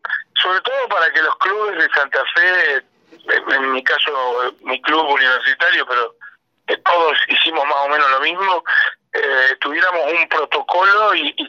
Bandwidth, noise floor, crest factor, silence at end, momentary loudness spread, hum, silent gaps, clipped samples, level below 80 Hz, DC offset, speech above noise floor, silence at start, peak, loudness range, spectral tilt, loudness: 7.6 kHz; -43 dBFS; 14 dB; 0 s; 6 LU; none; none; under 0.1%; -80 dBFS; under 0.1%; 27 dB; 0.05 s; -4 dBFS; 1 LU; -1.5 dB/octave; -15 LUFS